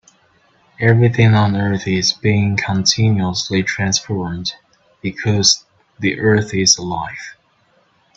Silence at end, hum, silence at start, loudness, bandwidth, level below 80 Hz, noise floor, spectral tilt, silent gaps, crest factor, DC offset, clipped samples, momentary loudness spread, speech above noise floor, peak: 0.85 s; none; 0.8 s; -16 LUFS; 7.8 kHz; -48 dBFS; -58 dBFS; -4 dB/octave; none; 18 dB; under 0.1%; under 0.1%; 12 LU; 42 dB; 0 dBFS